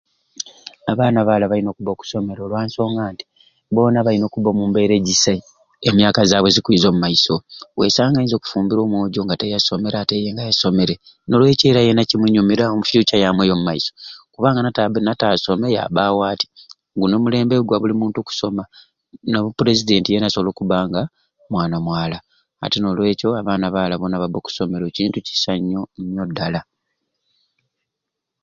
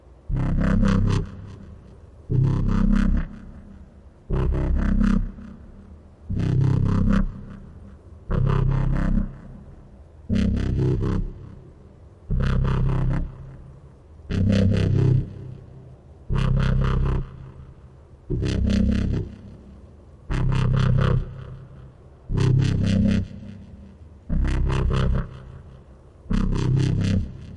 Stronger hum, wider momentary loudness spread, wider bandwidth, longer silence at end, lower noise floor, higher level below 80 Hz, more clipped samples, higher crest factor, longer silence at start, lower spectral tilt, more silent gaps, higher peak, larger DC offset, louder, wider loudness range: neither; second, 11 LU vs 22 LU; second, 7.6 kHz vs 9.4 kHz; first, 1.8 s vs 0 s; first, -81 dBFS vs -47 dBFS; second, -48 dBFS vs -28 dBFS; neither; about the same, 18 dB vs 14 dB; about the same, 0.4 s vs 0.3 s; second, -5 dB/octave vs -8 dB/octave; neither; first, 0 dBFS vs -8 dBFS; neither; first, -18 LUFS vs -23 LUFS; about the same, 6 LU vs 4 LU